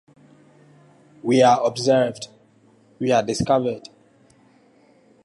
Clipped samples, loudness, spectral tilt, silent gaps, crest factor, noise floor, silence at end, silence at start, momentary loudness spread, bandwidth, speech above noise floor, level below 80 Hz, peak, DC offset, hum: under 0.1%; -20 LUFS; -5 dB/octave; none; 18 dB; -56 dBFS; 1.45 s; 1.25 s; 18 LU; 11.5 kHz; 37 dB; -56 dBFS; -4 dBFS; under 0.1%; none